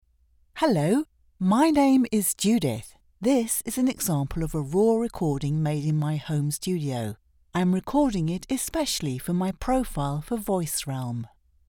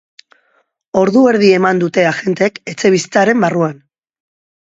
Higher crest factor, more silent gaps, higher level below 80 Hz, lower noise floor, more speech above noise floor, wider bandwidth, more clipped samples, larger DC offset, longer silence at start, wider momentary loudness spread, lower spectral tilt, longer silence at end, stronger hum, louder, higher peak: about the same, 16 dB vs 14 dB; neither; first, -46 dBFS vs -58 dBFS; about the same, -63 dBFS vs -60 dBFS; second, 38 dB vs 48 dB; first, over 20 kHz vs 8 kHz; neither; neither; second, 0.55 s vs 0.95 s; first, 10 LU vs 7 LU; about the same, -5.5 dB/octave vs -5.5 dB/octave; second, 0.45 s vs 0.95 s; neither; second, -25 LUFS vs -13 LUFS; second, -10 dBFS vs 0 dBFS